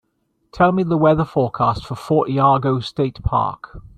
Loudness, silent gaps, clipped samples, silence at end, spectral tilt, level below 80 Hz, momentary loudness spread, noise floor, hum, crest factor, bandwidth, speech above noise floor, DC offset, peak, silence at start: -18 LUFS; none; under 0.1%; 0.2 s; -8.5 dB/octave; -40 dBFS; 7 LU; -68 dBFS; none; 16 dB; 12.5 kHz; 50 dB; under 0.1%; -2 dBFS; 0.55 s